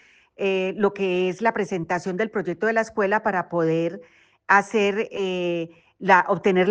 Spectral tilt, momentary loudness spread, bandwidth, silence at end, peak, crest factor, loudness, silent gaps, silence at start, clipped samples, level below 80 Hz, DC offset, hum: -6 dB/octave; 9 LU; 9 kHz; 0 s; -4 dBFS; 18 dB; -23 LUFS; none; 0.4 s; under 0.1%; -66 dBFS; under 0.1%; none